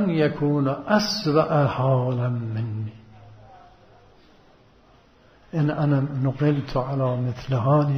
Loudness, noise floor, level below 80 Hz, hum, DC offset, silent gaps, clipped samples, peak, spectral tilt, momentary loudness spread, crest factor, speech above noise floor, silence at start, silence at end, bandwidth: -23 LUFS; -55 dBFS; -52 dBFS; none; under 0.1%; none; under 0.1%; -6 dBFS; -7 dB/octave; 8 LU; 18 dB; 33 dB; 0 s; 0 s; 15 kHz